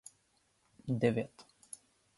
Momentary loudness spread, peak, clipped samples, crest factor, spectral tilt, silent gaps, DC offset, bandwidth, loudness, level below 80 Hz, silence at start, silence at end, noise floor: 20 LU; -16 dBFS; under 0.1%; 22 dB; -6.5 dB/octave; none; under 0.1%; 11.5 kHz; -35 LUFS; -72 dBFS; 0.85 s; 0.75 s; -74 dBFS